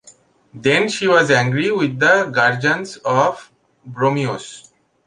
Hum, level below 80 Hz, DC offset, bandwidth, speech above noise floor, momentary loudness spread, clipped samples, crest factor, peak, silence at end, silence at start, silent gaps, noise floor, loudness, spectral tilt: none; -60 dBFS; under 0.1%; 11 kHz; 33 dB; 11 LU; under 0.1%; 18 dB; 0 dBFS; 0.45 s; 0.55 s; none; -50 dBFS; -16 LUFS; -5 dB/octave